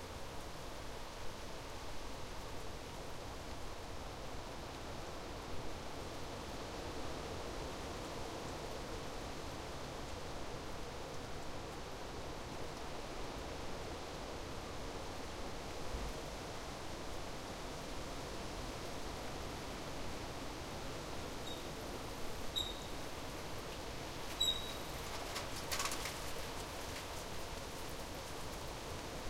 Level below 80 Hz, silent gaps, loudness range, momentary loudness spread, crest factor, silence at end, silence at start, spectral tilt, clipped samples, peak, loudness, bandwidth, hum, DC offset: -52 dBFS; none; 7 LU; 6 LU; 22 dB; 0 s; 0 s; -3.5 dB/octave; under 0.1%; -22 dBFS; -45 LUFS; 16 kHz; none; under 0.1%